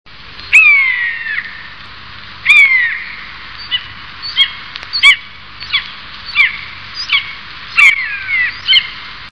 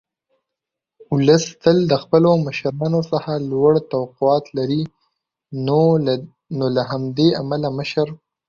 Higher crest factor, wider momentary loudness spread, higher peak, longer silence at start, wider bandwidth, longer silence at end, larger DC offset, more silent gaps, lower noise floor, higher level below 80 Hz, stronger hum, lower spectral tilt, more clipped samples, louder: about the same, 14 dB vs 18 dB; first, 23 LU vs 9 LU; about the same, 0 dBFS vs -2 dBFS; second, 0.15 s vs 1.1 s; first, 11 kHz vs 7.4 kHz; second, 0 s vs 0.35 s; first, 1% vs under 0.1%; neither; second, -32 dBFS vs -84 dBFS; first, -46 dBFS vs -56 dBFS; first, 50 Hz at -50 dBFS vs none; second, 0.5 dB/octave vs -6.5 dB/octave; first, 0.5% vs under 0.1%; first, -10 LUFS vs -19 LUFS